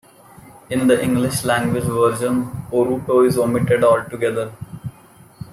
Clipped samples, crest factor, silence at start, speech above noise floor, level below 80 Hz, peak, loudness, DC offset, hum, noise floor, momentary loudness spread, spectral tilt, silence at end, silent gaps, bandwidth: under 0.1%; 16 dB; 0.45 s; 29 dB; -50 dBFS; -4 dBFS; -18 LUFS; under 0.1%; none; -47 dBFS; 16 LU; -6 dB/octave; 0.05 s; none; 15.5 kHz